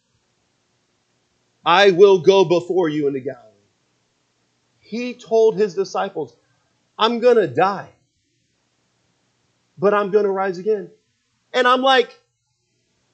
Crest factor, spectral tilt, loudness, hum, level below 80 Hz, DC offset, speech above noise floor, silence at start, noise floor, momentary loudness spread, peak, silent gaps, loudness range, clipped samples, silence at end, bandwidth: 20 dB; -5 dB/octave; -17 LUFS; 60 Hz at -60 dBFS; -76 dBFS; under 0.1%; 53 dB; 1.65 s; -70 dBFS; 16 LU; 0 dBFS; none; 6 LU; under 0.1%; 1.05 s; 8.2 kHz